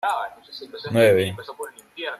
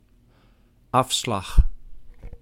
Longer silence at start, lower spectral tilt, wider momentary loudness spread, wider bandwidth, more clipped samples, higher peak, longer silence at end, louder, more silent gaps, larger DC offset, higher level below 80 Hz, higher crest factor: second, 0.05 s vs 0.95 s; first, -5.5 dB/octave vs -4 dB/octave; first, 19 LU vs 3 LU; second, 14.5 kHz vs 16 kHz; neither; about the same, -6 dBFS vs -4 dBFS; about the same, 0 s vs 0.05 s; first, -21 LUFS vs -24 LUFS; neither; neither; second, -64 dBFS vs -26 dBFS; about the same, 18 dB vs 20 dB